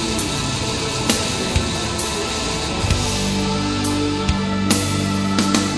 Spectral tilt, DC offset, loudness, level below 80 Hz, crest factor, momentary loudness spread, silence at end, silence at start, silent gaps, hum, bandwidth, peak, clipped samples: -4 dB/octave; under 0.1%; -20 LUFS; -32 dBFS; 20 dB; 3 LU; 0 s; 0 s; none; none; 11 kHz; 0 dBFS; under 0.1%